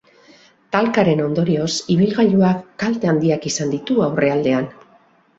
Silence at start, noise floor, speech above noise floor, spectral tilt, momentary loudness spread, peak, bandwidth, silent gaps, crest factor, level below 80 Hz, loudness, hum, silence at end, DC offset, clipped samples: 0.7 s; -54 dBFS; 37 dB; -6 dB/octave; 7 LU; -2 dBFS; 8 kHz; none; 16 dB; -56 dBFS; -18 LUFS; none; 0.65 s; under 0.1%; under 0.1%